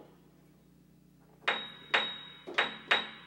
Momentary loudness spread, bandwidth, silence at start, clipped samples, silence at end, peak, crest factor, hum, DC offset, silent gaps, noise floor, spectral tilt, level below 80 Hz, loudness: 7 LU; 16.5 kHz; 0 s; under 0.1%; 0 s; -10 dBFS; 26 dB; none; under 0.1%; none; -61 dBFS; -2 dB/octave; -74 dBFS; -32 LUFS